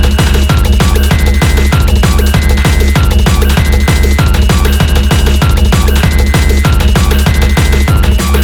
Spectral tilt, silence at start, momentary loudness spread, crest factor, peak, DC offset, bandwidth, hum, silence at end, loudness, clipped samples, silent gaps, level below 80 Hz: -5 dB/octave; 0 s; 1 LU; 6 dB; 0 dBFS; 0.6%; 20 kHz; none; 0 s; -9 LUFS; 0.3%; none; -8 dBFS